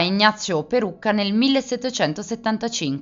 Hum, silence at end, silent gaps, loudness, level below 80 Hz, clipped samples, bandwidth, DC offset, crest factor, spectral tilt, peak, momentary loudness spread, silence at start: none; 0 s; none; -21 LUFS; -60 dBFS; under 0.1%; 7.8 kHz; under 0.1%; 20 dB; -4 dB/octave; 0 dBFS; 7 LU; 0 s